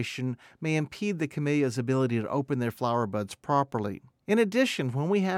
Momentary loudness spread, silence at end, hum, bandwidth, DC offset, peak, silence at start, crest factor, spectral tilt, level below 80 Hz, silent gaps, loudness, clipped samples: 8 LU; 0 s; none; 16 kHz; under 0.1%; -12 dBFS; 0 s; 16 dB; -6.5 dB/octave; -70 dBFS; none; -28 LUFS; under 0.1%